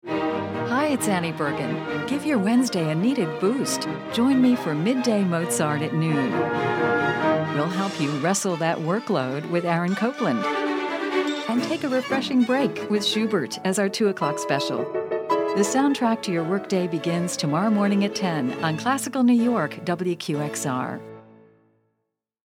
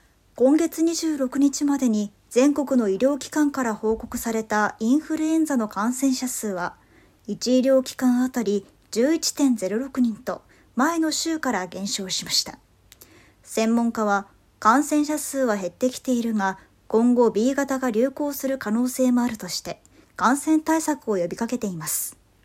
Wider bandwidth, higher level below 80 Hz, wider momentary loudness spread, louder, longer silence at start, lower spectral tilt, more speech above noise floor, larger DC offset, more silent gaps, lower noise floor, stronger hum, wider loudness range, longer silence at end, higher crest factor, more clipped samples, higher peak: about the same, 16.5 kHz vs 16 kHz; second, -68 dBFS vs -58 dBFS; second, 6 LU vs 9 LU; about the same, -23 LUFS vs -23 LUFS; second, 0.05 s vs 0.35 s; about the same, -5 dB/octave vs -4 dB/octave; first, 56 dB vs 30 dB; neither; neither; first, -79 dBFS vs -52 dBFS; neither; about the same, 2 LU vs 3 LU; first, 1.35 s vs 0.3 s; about the same, 16 dB vs 20 dB; neither; second, -8 dBFS vs -4 dBFS